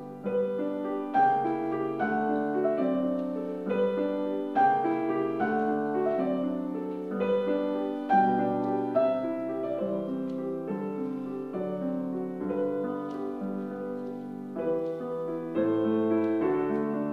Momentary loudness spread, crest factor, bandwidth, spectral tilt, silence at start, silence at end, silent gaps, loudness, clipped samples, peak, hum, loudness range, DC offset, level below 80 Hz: 9 LU; 16 dB; 6.6 kHz; -9 dB/octave; 0 s; 0 s; none; -29 LUFS; under 0.1%; -14 dBFS; none; 5 LU; under 0.1%; -72 dBFS